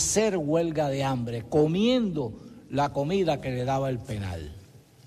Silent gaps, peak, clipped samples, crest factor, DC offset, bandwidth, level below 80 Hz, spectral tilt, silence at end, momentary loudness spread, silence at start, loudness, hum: none; -10 dBFS; under 0.1%; 18 dB; under 0.1%; 14 kHz; -50 dBFS; -5 dB/octave; 0.3 s; 12 LU; 0 s; -27 LUFS; none